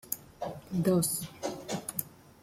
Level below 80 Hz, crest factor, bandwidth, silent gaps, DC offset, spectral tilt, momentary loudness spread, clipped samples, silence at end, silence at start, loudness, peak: -64 dBFS; 22 dB; 16.5 kHz; none; under 0.1%; -5 dB/octave; 14 LU; under 0.1%; 0.3 s; 0.05 s; -33 LUFS; -12 dBFS